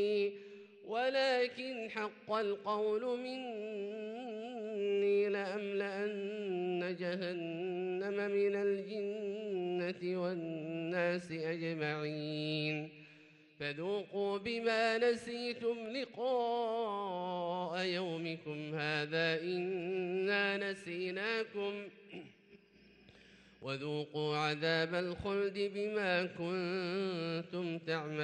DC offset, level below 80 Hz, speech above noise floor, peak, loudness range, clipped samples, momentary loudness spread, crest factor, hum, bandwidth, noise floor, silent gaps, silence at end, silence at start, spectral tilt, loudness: under 0.1%; -74 dBFS; 27 dB; -20 dBFS; 3 LU; under 0.1%; 9 LU; 16 dB; none; 10.5 kHz; -64 dBFS; none; 0 s; 0 s; -6 dB/octave; -37 LUFS